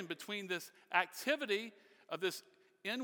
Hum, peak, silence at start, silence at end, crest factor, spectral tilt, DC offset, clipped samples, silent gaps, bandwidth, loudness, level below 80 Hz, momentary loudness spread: none; -16 dBFS; 0 s; 0 s; 26 dB; -3 dB/octave; under 0.1%; under 0.1%; none; over 20 kHz; -39 LUFS; under -90 dBFS; 11 LU